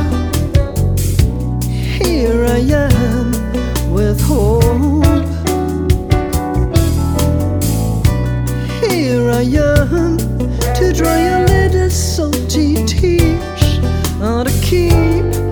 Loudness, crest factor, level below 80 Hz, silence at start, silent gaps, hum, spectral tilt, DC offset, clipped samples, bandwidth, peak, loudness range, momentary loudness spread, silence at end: -14 LUFS; 12 dB; -20 dBFS; 0 s; none; none; -6 dB/octave; under 0.1%; under 0.1%; over 20 kHz; 0 dBFS; 2 LU; 5 LU; 0 s